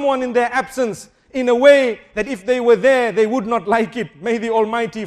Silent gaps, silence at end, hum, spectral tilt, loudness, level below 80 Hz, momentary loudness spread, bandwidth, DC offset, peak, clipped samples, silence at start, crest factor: none; 0 s; none; -4.5 dB/octave; -17 LUFS; -54 dBFS; 12 LU; 13 kHz; under 0.1%; 0 dBFS; under 0.1%; 0 s; 16 dB